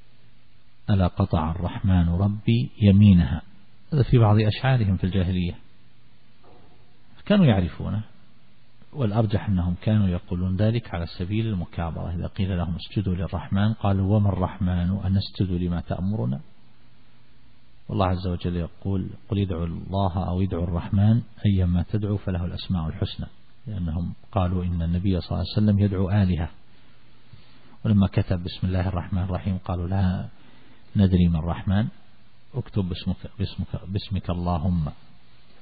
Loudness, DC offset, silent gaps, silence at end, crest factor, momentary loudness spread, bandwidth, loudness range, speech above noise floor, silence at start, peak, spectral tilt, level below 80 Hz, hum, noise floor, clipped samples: -24 LUFS; 0.9%; none; 0.7 s; 18 dB; 11 LU; 4.9 kHz; 8 LU; 36 dB; 0.9 s; -6 dBFS; -12.5 dB/octave; -40 dBFS; none; -58 dBFS; under 0.1%